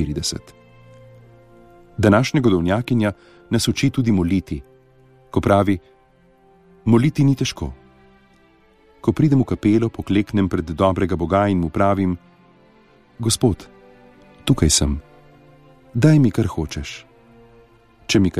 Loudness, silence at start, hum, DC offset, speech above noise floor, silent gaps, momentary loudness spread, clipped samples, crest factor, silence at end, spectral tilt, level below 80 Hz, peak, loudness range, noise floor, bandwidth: -19 LUFS; 0 s; none; under 0.1%; 36 dB; none; 15 LU; under 0.1%; 20 dB; 0 s; -5.5 dB/octave; -38 dBFS; 0 dBFS; 3 LU; -54 dBFS; 15.5 kHz